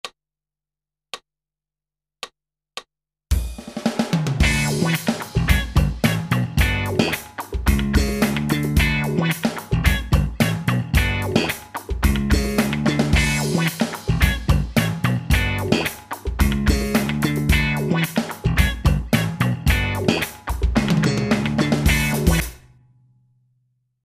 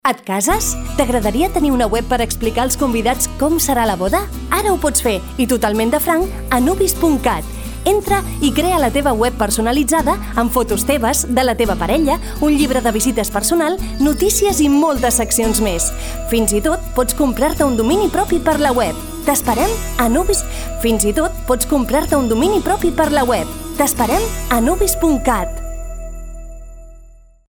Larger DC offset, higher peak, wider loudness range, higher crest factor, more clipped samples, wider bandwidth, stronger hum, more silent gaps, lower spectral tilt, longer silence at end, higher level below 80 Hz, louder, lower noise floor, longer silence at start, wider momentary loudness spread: neither; about the same, -2 dBFS vs 0 dBFS; about the same, 3 LU vs 1 LU; about the same, 20 dB vs 16 dB; neither; second, 16 kHz vs over 20 kHz; neither; neither; first, -5.5 dB/octave vs -4 dB/octave; first, 1.45 s vs 0.45 s; about the same, -26 dBFS vs -26 dBFS; second, -21 LUFS vs -16 LUFS; first, -90 dBFS vs -42 dBFS; about the same, 0.05 s vs 0.05 s; first, 8 LU vs 5 LU